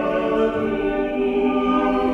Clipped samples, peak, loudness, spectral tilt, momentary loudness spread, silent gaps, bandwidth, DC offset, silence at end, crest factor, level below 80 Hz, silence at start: under 0.1%; -8 dBFS; -21 LUFS; -7.5 dB/octave; 3 LU; none; 7.2 kHz; under 0.1%; 0 s; 12 dB; -42 dBFS; 0 s